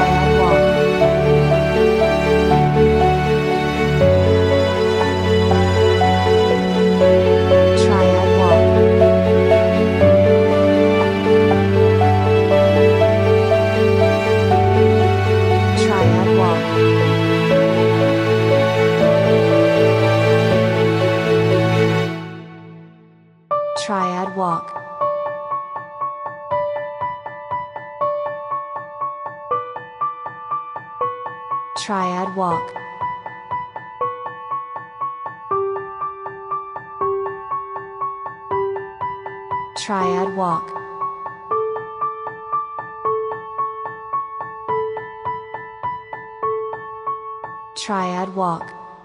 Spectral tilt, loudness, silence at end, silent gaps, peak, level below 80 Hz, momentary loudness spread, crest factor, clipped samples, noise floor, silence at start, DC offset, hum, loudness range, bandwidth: -7 dB/octave; -17 LUFS; 0.1 s; none; -2 dBFS; -38 dBFS; 14 LU; 16 dB; under 0.1%; -49 dBFS; 0 s; under 0.1%; none; 12 LU; 13 kHz